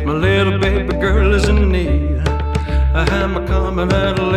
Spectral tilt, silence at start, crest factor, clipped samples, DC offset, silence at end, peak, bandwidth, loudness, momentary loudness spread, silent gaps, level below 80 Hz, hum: -6.5 dB/octave; 0 s; 14 dB; under 0.1%; under 0.1%; 0 s; -2 dBFS; 9.8 kHz; -16 LUFS; 4 LU; none; -18 dBFS; none